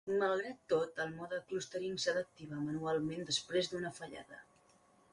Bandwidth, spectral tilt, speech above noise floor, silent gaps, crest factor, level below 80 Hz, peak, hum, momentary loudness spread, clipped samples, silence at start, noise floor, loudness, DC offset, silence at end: 11.5 kHz; -4 dB/octave; 30 dB; none; 18 dB; -74 dBFS; -22 dBFS; none; 13 LU; under 0.1%; 0.05 s; -68 dBFS; -38 LUFS; under 0.1%; 0.7 s